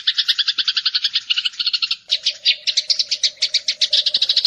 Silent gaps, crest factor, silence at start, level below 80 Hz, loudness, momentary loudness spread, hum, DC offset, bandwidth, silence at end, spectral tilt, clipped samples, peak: none; 16 dB; 0 s; -72 dBFS; -17 LUFS; 4 LU; none; under 0.1%; 13.5 kHz; 0 s; 4 dB/octave; under 0.1%; -4 dBFS